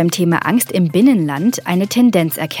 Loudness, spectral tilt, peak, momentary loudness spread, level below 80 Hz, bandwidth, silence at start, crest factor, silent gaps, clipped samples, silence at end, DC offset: -14 LUFS; -5.5 dB/octave; -2 dBFS; 5 LU; -62 dBFS; 18.5 kHz; 0 s; 12 dB; none; under 0.1%; 0 s; under 0.1%